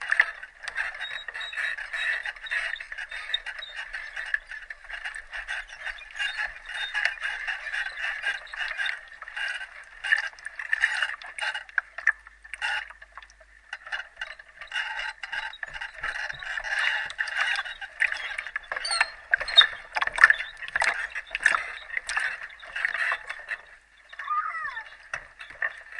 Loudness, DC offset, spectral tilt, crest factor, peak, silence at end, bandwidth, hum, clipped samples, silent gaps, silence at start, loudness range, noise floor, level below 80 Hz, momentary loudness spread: -28 LUFS; under 0.1%; 1.5 dB/octave; 30 dB; 0 dBFS; 0 s; 11.5 kHz; none; under 0.1%; none; 0 s; 11 LU; -53 dBFS; -58 dBFS; 13 LU